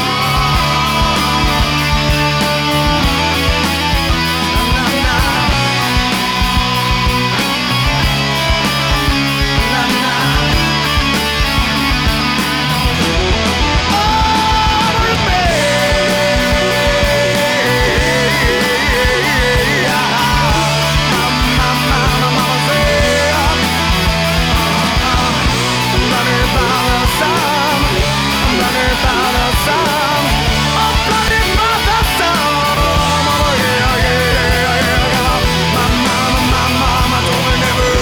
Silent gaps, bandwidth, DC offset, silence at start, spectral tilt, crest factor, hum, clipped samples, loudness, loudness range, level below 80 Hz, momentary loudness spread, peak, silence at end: none; over 20 kHz; under 0.1%; 0 s; -4 dB/octave; 10 dB; none; under 0.1%; -12 LUFS; 1 LU; -22 dBFS; 1 LU; -2 dBFS; 0 s